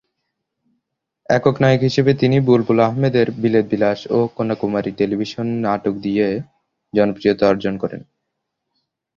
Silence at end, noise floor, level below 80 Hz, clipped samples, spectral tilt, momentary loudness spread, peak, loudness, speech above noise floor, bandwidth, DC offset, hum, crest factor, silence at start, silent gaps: 1.15 s; -77 dBFS; -52 dBFS; under 0.1%; -7.5 dB/octave; 8 LU; 0 dBFS; -18 LUFS; 60 dB; 7.4 kHz; under 0.1%; none; 18 dB; 1.3 s; none